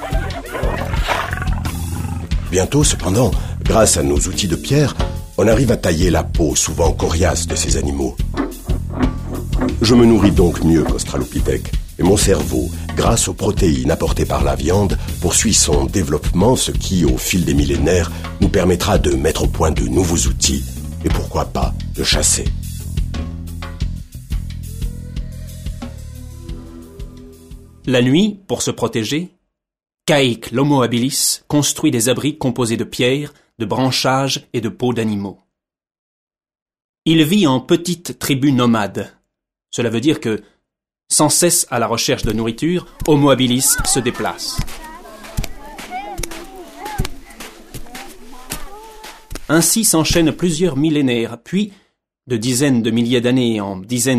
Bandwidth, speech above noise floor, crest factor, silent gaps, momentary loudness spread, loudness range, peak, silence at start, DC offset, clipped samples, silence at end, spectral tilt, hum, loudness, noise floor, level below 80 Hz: 15.5 kHz; 62 dB; 16 dB; 35.99-36.27 s, 36.62-36.66 s, 36.84-36.94 s; 17 LU; 10 LU; 0 dBFS; 0 s; under 0.1%; under 0.1%; 0 s; -4.5 dB/octave; none; -16 LUFS; -77 dBFS; -26 dBFS